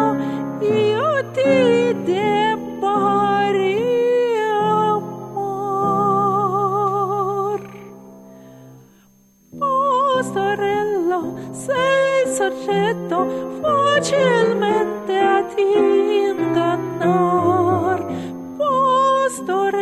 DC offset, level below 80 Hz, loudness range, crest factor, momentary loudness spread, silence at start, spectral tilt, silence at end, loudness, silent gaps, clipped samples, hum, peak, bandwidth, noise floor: under 0.1%; -60 dBFS; 5 LU; 14 dB; 7 LU; 0 s; -5.5 dB/octave; 0 s; -18 LUFS; none; under 0.1%; none; -4 dBFS; 13.5 kHz; -53 dBFS